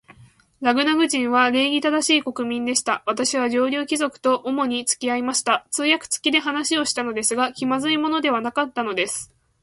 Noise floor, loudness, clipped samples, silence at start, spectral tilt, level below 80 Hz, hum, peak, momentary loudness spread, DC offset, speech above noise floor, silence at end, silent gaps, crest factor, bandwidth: -51 dBFS; -21 LUFS; under 0.1%; 0.1 s; -1.5 dB/octave; -64 dBFS; none; -4 dBFS; 6 LU; under 0.1%; 29 dB; 0.4 s; none; 18 dB; 11.5 kHz